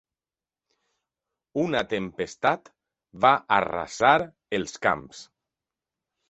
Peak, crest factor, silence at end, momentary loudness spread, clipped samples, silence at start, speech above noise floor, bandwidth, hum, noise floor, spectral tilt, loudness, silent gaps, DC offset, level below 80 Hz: -2 dBFS; 24 dB; 1.05 s; 12 LU; under 0.1%; 1.55 s; over 65 dB; 8.2 kHz; none; under -90 dBFS; -4.5 dB/octave; -25 LUFS; none; under 0.1%; -60 dBFS